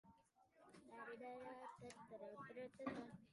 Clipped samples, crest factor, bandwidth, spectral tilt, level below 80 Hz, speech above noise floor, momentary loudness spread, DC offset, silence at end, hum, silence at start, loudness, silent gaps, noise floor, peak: under 0.1%; 24 dB; 11 kHz; -5.5 dB/octave; -86 dBFS; 21 dB; 10 LU; under 0.1%; 0 s; none; 0.05 s; -56 LUFS; none; -76 dBFS; -34 dBFS